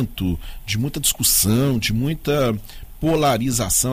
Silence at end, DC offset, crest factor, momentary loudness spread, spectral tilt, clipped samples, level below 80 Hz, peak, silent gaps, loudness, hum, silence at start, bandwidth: 0 s; under 0.1%; 14 dB; 10 LU; -4 dB/octave; under 0.1%; -34 dBFS; -6 dBFS; none; -19 LUFS; none; 0 s; 16 kHz